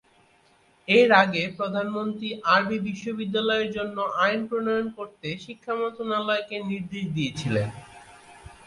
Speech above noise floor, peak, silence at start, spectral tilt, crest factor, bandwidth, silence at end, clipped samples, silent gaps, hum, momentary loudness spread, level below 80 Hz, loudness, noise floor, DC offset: 35 dB; -4 dBFS; 0.9 s; -5.5 dB/octave; 22 dB; 11.5 kHz; 0.15 s; under 0.1%; none; none; 14 LU; -60 dBFS; -25 LUFS; -61 dBFS; under 0.1%